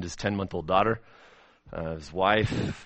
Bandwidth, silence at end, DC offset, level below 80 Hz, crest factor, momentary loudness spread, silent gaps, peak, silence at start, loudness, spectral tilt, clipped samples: 8.4 kHz; 0 s; under 0.1%; -48 dBFS; 22 dB; 12 LU; none; -6 dBFS; 0 s; -27 LUFS; -5.5 dB/octave; under 0.1%